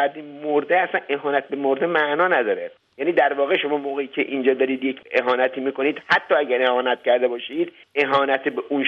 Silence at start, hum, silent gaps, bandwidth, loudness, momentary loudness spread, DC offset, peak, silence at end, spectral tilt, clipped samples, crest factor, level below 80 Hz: 0 s; none; none; 6.8 kHz; -21 LUFS; 7 LU; under 0.1%; -4 dBFS; 0 s; -6 dB/octave; under 0.1%; 16 dB; -70 dBFS